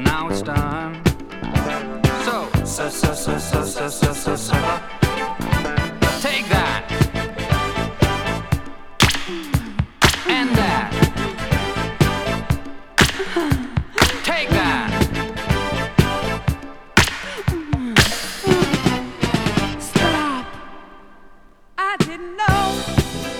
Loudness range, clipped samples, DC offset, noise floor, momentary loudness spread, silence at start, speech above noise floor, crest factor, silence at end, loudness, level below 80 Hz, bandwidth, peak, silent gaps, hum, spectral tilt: 3 LU; under 0.1%; under 0.1%; -45 dBFS; 8 LU; 0 s; 25 dB; 20 dB; 0 s; -20 LUFS; -30 dBFS; 19.5 kHz; 0 dBFS; none; none; -4.5 dB/octave